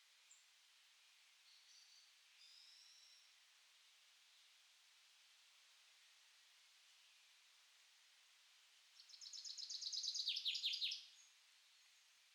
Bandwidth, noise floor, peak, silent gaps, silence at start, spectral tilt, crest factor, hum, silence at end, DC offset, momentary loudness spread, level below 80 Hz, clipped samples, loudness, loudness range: 19 kHz; -72 dBFS; -32 dBFS; none; 0.1 s; 7.5 dB/octave; 24 dB; none; 0.35 s; under 0.1%; 27 LU; under -90 dBFS; under 0.1%; -44 LUFS; 22 LU